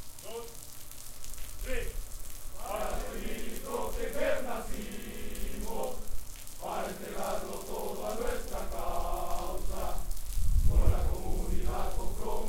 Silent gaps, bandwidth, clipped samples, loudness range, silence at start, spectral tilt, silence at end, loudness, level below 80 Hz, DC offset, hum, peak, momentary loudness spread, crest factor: none; 17 kHz; under 0.1%; 5 LU; 0 s; -5 dB/octave; 0 s; -37 LUFS; -34 dBFS; under 0.1%; none; -10 dBFS; 12 LU; 20 dB